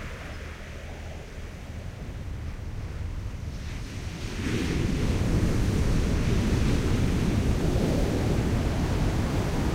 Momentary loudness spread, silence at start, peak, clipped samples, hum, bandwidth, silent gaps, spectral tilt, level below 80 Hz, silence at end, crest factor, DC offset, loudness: 14 LU; 0 s; -12 dBFS; under 0.1%; none; 16 kHz; none; -6.5 dB/octave; -32 dBFS; 0 s; 14 dB; under 0.1%; -28 LUFS